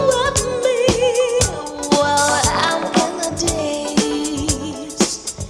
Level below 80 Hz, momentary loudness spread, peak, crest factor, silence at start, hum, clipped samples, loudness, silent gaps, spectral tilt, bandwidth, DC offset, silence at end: -36 dBFS; 6 LU; -2 dBFS; 16 dB; 0 s; none; under 0.1%; -18 LUFS; none; -3.5 dB/octave; 16 kHz; under 0.1%; 0 s